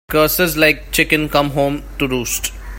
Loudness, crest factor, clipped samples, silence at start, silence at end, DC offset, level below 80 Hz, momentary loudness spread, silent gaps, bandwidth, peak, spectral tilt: -16 LUFS; 16 dB; under 0.1%; 0.1 s; 0 s; under 0.1%; -32 dBFS; 7 LU; none; 16.5 kHz; 0 dBFS; -3.5 dB/octave